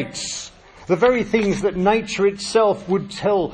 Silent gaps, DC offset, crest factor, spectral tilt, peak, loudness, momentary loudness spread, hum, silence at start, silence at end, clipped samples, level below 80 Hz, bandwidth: none; under 0.1%; 16 dB; -4.5 dB/octave; -4 dBFS; -20 LUFS; 10 LU; none; 0 s; 0 s; under 0.1%; -46 dBFS; 10.5 kHz